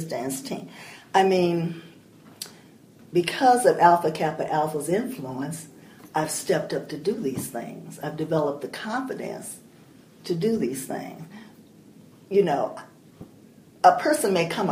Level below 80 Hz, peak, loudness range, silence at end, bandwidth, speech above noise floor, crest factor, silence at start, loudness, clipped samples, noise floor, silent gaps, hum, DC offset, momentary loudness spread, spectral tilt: -68 dBFS; -2 dBFS; 8 LU; 0 s; 15.5 kHz; 27 dB; 22 dB; 0 s; -24 LUFS; under 0.1%; -51 dBFS; none; none; under 0.1%; 20 LU; -5 dB/octave